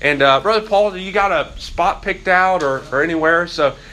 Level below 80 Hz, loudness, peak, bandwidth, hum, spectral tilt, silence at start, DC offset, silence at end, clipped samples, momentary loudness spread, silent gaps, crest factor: -40 dBFS; -16 LUFS; 0 dBFS; 12.5 kHz; none; -4.5 dB/octave; 0 s; under 0.1%; 0 s; under 0.1%; 6 LU; none; 16 dB